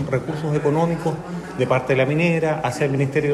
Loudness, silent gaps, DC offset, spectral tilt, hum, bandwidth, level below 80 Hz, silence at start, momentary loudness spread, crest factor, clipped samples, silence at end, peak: -21 LUFS; none; under 0.1%; -7 dB/octave; none; 13 kHz; -50 dBFS; 0 s; 7 LU; 16 dB; under 0.1%; 0 s; -4 dBFS